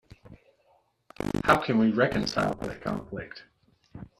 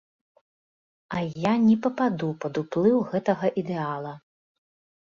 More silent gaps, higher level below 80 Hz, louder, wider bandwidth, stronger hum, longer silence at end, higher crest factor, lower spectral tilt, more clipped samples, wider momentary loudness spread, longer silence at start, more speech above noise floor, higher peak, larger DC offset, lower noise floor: neither; first, -52 dBFS vs -66 dBFS; about the same, -27 LUFS vs -25 LUFS; first, 13.5 kHz vs 7.2 kHz; neither; second, 0.15 s vs 0.85 s; first, 24 dB vs 18 dB; second, -6 dB/octave vs -8 dB/octave; neither; first, 19 LU vs 10 LU; second, 0.25 s vs 1.1 s; second, 40 dB vs over 66 dB; about the same, -6 dBFS vs -8 dBFS; neither; second, -67 dBFS vs under -90 dBFS